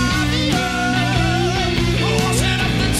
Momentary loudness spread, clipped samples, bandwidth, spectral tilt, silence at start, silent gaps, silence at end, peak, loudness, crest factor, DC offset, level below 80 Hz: 1 LU; under 0.1%; 15 kHz; -4.5 dB/octave; 0 s; none; 0 s; -6 dBFS; -17 LUFS; 12 dB; under 0.1%; -28 dBFS